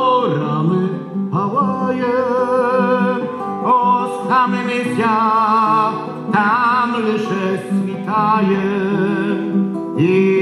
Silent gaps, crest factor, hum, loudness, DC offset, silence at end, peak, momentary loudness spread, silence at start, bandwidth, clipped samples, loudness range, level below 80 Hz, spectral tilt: none; 14 dB; none; -17 LUFS; under 0.1%; 0 s; -2 dBFS; 6 LU; 0 s; 11 kHz; under 0.1%; 2 LU; -62 dBFS; -7.5 dB/octave